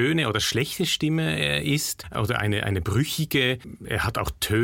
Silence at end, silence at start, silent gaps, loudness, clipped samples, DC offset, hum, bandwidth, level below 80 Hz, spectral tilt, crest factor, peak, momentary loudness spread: 0 s; 0 s; none; -24 LUFS; under 0.1%; under 0.1%; none; 17 kHz; -44 dBFS; -4.5 dB/octave; 16 dB; -8 dBFS; 5 LU